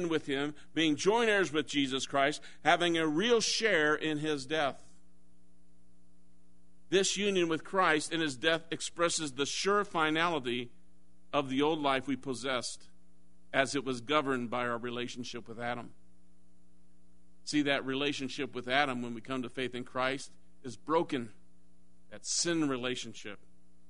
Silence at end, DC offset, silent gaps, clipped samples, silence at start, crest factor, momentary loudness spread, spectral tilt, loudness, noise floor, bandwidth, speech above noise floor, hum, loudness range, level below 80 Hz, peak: 0.55 s; 0.5%; none; under 0.1%; 0 s; 24 dB; 12 LU; -3 dB/octave; -32 LUFS; -67 dBFS; 10.5 kHz; 35 dB; none; 7 LU; -68 dBFS; -10 dBFS